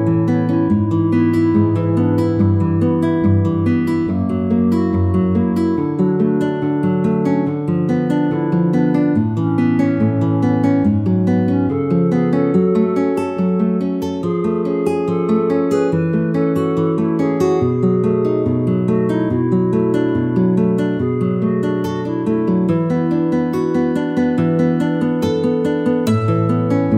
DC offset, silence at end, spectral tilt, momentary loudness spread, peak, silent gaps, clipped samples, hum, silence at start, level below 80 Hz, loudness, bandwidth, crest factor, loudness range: under 0.1%; 0 s; -9.5 dB/octave; 3 LU; -2 dBFS; none; under 0.1%; none; 0 s; -50 dBFS; -17 LUFS; 12 kHz; 14 dB; 2 LU